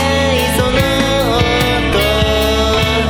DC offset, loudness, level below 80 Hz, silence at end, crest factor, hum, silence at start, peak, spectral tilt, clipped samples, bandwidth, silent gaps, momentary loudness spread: 0.2%; -13 LUFS; -22 dBFS; 0 s; 12 dB; none; 0 s; 0 dBFS; -4.5 dB/octave; under 0.1%; 17.5 kHz; none; 1 LU